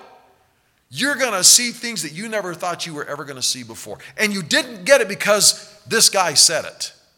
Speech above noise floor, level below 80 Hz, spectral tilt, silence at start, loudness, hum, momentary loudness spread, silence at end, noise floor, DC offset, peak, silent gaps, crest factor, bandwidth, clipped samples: 43 dB; -66 dBFS; -0.5 dB/octave; 0.9 s; -16 LUFS; none; 17 LU; 0.25 s; -61 dBFS; under 0.1%; 0 dBFS; none; 20 dB; 19 kHz; under 0.1%